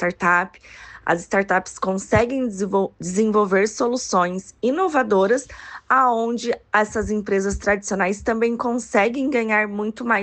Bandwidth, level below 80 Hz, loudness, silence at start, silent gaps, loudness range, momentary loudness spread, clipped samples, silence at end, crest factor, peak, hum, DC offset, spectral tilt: 9 kHz; -46 dBFS; -21 LUFS; 0 s; none; 1 LU; 7 LU; under 0.1%; 0 s; 16 dB; -4 dBFS; none; under 0.1%; -5 dB/octave